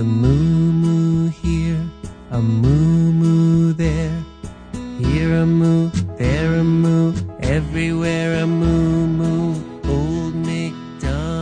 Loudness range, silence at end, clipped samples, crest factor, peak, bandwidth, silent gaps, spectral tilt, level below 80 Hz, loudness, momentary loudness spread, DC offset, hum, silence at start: 2 LU; 0 s; under 0.1%; 14 dB; -4 dBFS; 9.4 kHz; none; -8 dB/octave; -30 dBFS; -18 LUFS; 10 LU; under 0.1%; none; 0 s